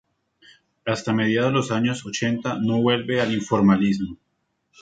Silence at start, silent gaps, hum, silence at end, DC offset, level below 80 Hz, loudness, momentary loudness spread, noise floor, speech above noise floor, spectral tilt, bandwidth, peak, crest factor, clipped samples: 0.85 s; none; none; 0.65 s; under 0.1%; -56 dBFS; -22 LUFS; 9 LU; -68 dBFS; 47 dB; -6 dB/octave; 9.2 kHz; -6 dBFS; 18 dB; under 0.1%